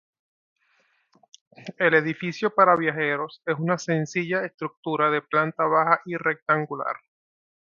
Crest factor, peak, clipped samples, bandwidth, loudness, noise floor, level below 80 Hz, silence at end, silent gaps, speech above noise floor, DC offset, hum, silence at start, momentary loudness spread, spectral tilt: 22 dB; -2 dBFS; under 0.1%; 7.2 kHz; -23 LUFS; -67 dBFS; -74 dBFS; 0.8 s; 4.54-4.58 s, 4.77-4.83 s, 6.42-6.46 s; 43 dB; under 0.1%; none; 1.6 s; 11 LU; -6 dB/octave